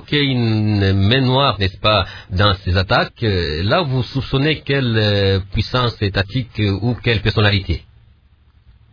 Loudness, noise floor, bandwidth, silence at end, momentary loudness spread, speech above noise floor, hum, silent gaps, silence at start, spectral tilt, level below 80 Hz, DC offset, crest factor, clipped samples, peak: -17 LUFS; -52 dBFS; 5.4 kHz; 1.1 s; 5 LU; 35 dB; none; none; 0 s; -7.5 dB/octave; -34 dBFS; under 0.1%; 16 dB; under 0.1%; -2 dBFS